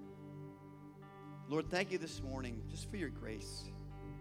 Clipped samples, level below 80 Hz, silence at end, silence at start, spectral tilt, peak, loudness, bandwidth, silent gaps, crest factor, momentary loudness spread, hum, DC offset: under 0.1%; -56 dBFS; 0 s; 0 s; -5 dB/octave; -20 dBFS; -44 LUFS; 16 kHz; none; 24 dB; 17 LU; 50 Hz at -60 dBFS; under 0.1%